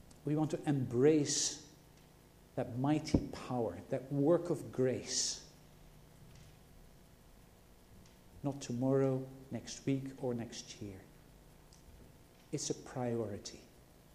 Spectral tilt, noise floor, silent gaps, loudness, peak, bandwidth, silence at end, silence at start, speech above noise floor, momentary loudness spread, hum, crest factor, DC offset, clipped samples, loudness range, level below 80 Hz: -5 dB/octave; -61 dBFS; none; -36 LUFS; -14 dBFS; 15.5 kHz; 0.5 s; 0.1 s; 26 dB; 15 LU; 50 Hz at -65 dBFS; 24 dB; under 0.1%; under 0.1%; 9 LU; -60 dBFS